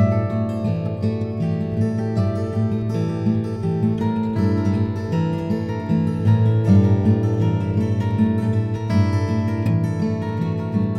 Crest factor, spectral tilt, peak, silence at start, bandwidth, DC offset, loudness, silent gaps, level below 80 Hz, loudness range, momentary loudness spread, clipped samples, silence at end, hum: 14 dB; -9.5 dB/octave; -4 dBFS; 0 s; 6.6 kHz; under 0.1%; -21 LUFS; none; -50 dBFS; 3 LU; 6 LU; under 0.1%; 0 s; none